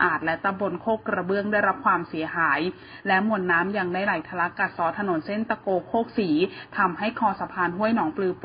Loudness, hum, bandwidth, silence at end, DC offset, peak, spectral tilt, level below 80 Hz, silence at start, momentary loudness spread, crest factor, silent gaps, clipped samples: -25 LUFS; none; 5.2 kHz; 0 s; under 0.1%; -6 dBFS; -10.5 dB/octave; -60 dBFS; 0 s; 5 LU; 18 dB; none; under 0.1%